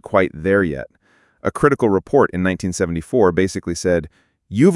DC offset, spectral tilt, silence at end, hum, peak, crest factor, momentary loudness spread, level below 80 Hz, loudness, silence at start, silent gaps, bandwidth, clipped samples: under 0.1%; -6.5 dB/octave; 0 s; none; 0 dBFS; 18 dB; 10 LU; -46 dBFS; -18 LUFS; 0.1 s; none; 12 kHz; under 0.1%